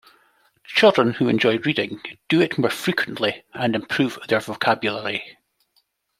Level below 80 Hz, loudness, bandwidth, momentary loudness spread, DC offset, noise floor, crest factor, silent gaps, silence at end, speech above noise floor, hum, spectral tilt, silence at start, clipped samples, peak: -64 dBFS; -21 LUFS; 16 kHz; 10 LU; under 0.1%; -67 dBFS; 20 dB; none; 0.9 s; 46 dB; none; -5.5 dB/octave; 0.7 s; under 0.1%; -2 dBFS